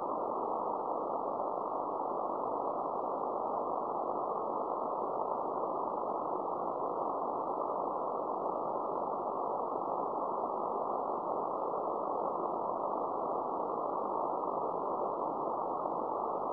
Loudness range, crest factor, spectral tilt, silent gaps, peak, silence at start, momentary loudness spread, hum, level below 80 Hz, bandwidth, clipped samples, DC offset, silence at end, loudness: 0 LU; 14 dB; -8.5 dB/octave; none; -20 dBFS; 0 s; 1 LU; none; -76 dBFS; 5.4 kHz; under 0.1%; under 0.1%; 0 s; -36 LUFS